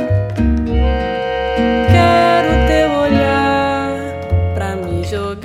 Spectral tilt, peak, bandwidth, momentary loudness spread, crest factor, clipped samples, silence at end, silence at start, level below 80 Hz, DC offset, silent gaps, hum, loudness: -7 dB/octave; 0 dBFS; 12.5 kHz; 9 LU; 14 dB; under 0.1%; 0 s; 0 s; -22 dBFS; under 0.1%; none; none; -15 LUFS